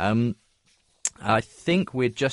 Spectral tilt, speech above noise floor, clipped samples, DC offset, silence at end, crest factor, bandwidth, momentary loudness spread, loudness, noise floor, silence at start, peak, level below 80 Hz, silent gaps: -5 dB/octave; 41 dB; under 0.1%; under 0.1%; 0 s; 18 dB; 11.5 kHz; 7 LU; -25 LUFS; -65 dBFS; 0 s; -8 dBFS; -58 dBFS; none